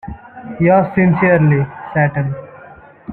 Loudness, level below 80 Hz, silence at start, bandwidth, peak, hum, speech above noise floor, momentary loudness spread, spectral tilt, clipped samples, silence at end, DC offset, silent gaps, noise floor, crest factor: -14 LUFS; -44 dBFS; 0.05 s; 3.3 kHz; -2 dBFS; none; 27 dB; 21 LU; -12.5 dB/octave; under 0.1%; 0 s; under 0.1%; none; -40 dBFS; 14 dB